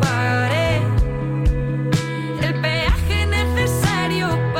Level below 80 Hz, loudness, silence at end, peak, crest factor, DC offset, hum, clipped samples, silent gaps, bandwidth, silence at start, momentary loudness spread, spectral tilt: -26 dBFS; -20 LUFS; 0 s; -8 dBFS; 10 dB; under 0.1%; none; under 0.1%; none; 16.5 kHz; 0 s; 4 LU; -5.5 dB/octave